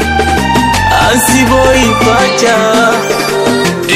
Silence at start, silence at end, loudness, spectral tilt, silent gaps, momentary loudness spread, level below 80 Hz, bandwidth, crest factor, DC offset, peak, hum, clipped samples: 0 s; 0 s; -8 LUFS; -4 dB/octave; none; 4 LU; -24 dBFS; 16.5 kHz; 8 dB; under 0.1%; 0 dBFS; none; 0.3%